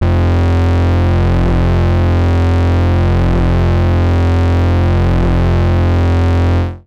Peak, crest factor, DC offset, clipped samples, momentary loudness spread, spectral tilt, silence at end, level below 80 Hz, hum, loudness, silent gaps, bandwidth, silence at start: -10 dBFS; 0 dB; under 0.1%; under 0.1%; 1 LU; -8.5 dB/octave; 0.1 s; -18 dBFS; none; -13 LUFS; none; 6.4 kHz; 0 s